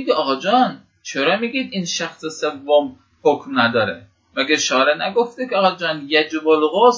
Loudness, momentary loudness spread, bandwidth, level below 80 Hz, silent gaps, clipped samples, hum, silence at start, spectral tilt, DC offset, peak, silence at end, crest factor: -18 LUFS; 9 LU; 7.8 kHz; -64 dBFS; none; under 0.1%; none; 0 s; -3.5 dB/octave; under 0.1%; 0 dBFS; 0 s; 18 dB